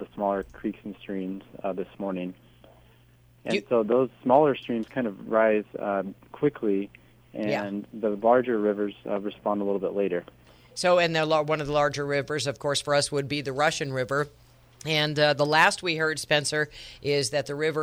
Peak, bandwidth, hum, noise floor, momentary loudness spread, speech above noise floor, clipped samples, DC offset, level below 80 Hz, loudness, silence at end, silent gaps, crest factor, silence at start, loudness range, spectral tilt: -6 dBFS; over 20 kHz; none; -57 dBFS; 13 LU; 31 dB; under 0.1%; under 0.1%; -60 dBFS; -26 LUFS; 0 s; none; 20 dB; 0 s; 4 LU; -4.5 dB/octave